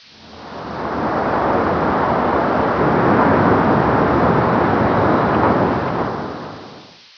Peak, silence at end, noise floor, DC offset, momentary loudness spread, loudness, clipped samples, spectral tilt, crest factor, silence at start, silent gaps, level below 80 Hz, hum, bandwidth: -2 dBFS; 0.35 s; -40 dBFS; 0.2%; 15 LU; -16 LUFS; under 0.1%; -8.5 dB/octave; 16 dB; 0.2 s; none; -38 dBFS; none; 5.4 kHz